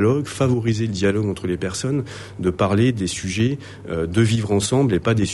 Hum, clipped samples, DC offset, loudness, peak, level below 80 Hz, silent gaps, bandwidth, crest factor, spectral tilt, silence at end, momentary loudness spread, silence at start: none; under 0.1%; under 0.1%; -21 LUFS; -4 dBFS; -46 dBFS; none; 11.5 kHz; 16 dB; -6 dB/octave; 0 s; 7 LU; 0 s